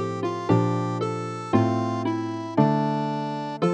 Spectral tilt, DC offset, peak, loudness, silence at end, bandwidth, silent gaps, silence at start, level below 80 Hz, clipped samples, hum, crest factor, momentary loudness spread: -8 dB/octave; under 0.1%; -6 dBFS; -25 LUFS; 0 s; 9.4 kHz; none; 0 s; -64 dBFS; under 0.1%; none; 20 dB; 7 LU